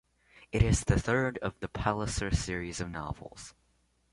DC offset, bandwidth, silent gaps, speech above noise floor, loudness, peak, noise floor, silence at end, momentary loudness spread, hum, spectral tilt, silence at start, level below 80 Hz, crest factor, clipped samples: under 0.1%; 11.5 kHz; none; 40 dB; -31 LUFS; -12 dBFS; -71 dBFS; 0.6 s; 15 LU; none; -5.5 dB/octave; 0.4 s; -40 dBFS; 20 dB; under 0.1%